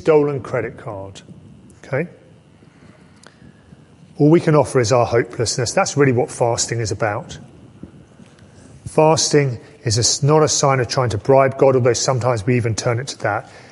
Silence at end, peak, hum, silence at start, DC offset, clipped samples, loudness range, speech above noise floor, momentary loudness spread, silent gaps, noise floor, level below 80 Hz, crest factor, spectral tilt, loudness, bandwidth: 0.1 s; -2 dBFS; none; 0 s; under 0.1%; under 0.1%; 10 LU; 31 dB; 13 LU; none; -48 dBFS; -48 dBFS; 18 dB; -4.5 dB/octave; -17 LUFS; 11.5 kHz